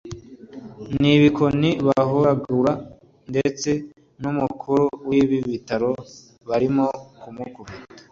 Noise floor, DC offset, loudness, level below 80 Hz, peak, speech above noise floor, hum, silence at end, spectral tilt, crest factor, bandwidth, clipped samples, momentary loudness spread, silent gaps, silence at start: -40 dBFS; under 0.1%; -21 LUFS; -52 dBFS; -4 dBFS; 20 dB; none; 0.1 s; -6.5 dB/octave; 18 dB; 7.4 kHz; under 0.1%; 22 LU; none; 0.05 s